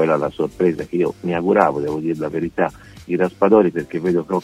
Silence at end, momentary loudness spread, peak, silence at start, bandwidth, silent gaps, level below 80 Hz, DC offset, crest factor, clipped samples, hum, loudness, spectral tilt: 0 s; 8 LU; 0 dBFS; 0 s; 12.5 kHz; none; -50 dBFS; under 0.1%; 18 dB; under 0.1%; none; -19 LUFS; -8 dB/octave